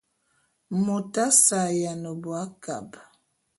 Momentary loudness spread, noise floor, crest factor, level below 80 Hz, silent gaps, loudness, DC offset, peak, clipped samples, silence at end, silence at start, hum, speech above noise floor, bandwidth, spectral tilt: 18 LU; -70 dBFS; 24 dB; -70 dBFS; none; -23 LUFS; under 0.1%; -4 dBFS; under 0.1%; 0.55 s; 0.7 s; none; 45 dB; 12 kHz; -3.5 dB/octave